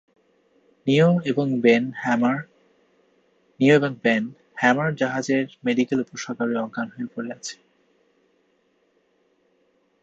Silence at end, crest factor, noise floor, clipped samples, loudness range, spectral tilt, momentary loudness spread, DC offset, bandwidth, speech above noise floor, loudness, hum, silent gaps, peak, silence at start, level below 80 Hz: 2.5 s; 20 dB; -66 dBFS; under 0.1%; 10 LU; -6 dB/octave; 14 LU; under 0.1%; 8 kHz; 44 dB; -22 LUFS; none; none; -4 dBFS; 0.85 s; -68 dBFS